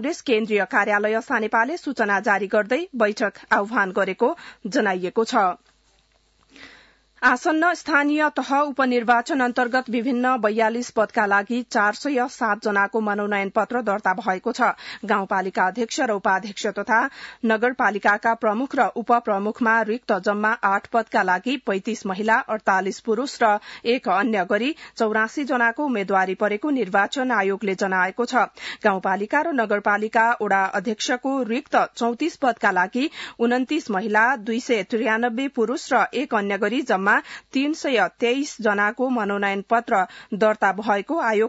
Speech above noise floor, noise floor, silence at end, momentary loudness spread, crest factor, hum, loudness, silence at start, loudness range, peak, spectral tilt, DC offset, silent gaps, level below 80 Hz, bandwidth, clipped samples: 40 dB; -62 dBFS; 0 s; 5 LU; 16 dB; none; -22 LUFS; 0 s; 2 LU; -6 dBFS; -4.5 dB/octave; under 0.1%; none; -68 dBFS; 8 kHz; under 0.1%